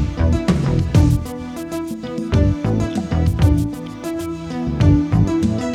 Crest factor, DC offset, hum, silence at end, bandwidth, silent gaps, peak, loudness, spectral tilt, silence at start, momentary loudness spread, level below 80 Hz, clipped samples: 16 dB; under 0.1%; none; 0 s; 14.5 kHz; none; 0 dBFS; -19 LUFS; -7.5 dB/octave; 0 s; 11 LU; -26 dBFS; under 0.1%